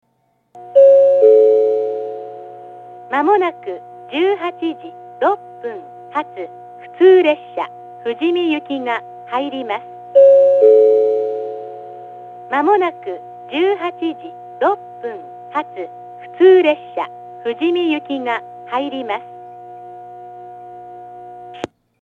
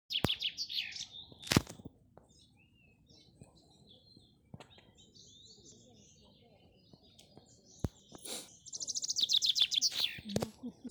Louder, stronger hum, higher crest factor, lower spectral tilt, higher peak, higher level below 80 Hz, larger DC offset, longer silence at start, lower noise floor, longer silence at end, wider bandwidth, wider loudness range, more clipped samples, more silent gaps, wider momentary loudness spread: first, -15 LUFS vs -33 LUFS; first, 60 Hz at -55 dBFS vs none; second, 16 dB vs 36 dB; first, -6 dB/octave vs -2.5 dB/octave; first, 0 dBFS vs -4 dBFS; second, -74 dBFS vs -60 dBFS; neither; first, 0.55 s vs 0.1 s; about the same, -63 dBFS vs -66 dBFS; first, 0.35 s vs 0 s; second, 4.3 kHz vs over 20 kHz; second, 9 LU vs 26 LU; neither; neither; second, 25 LU vs 28 LU